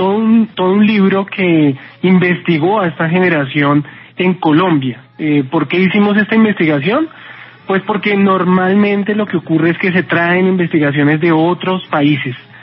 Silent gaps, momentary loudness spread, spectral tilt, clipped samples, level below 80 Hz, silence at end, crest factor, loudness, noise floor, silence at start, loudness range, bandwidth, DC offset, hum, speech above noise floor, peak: none; 6 LU; -5.5 dB/octave; under 0.1%; -64 dBFS; 0.05 s; 12 dB; -13 LUFS; -35 dBFS; 0 s; 1 LU; 5.6 kHz; under 0.1%; none; 23 dB; 0 dBFS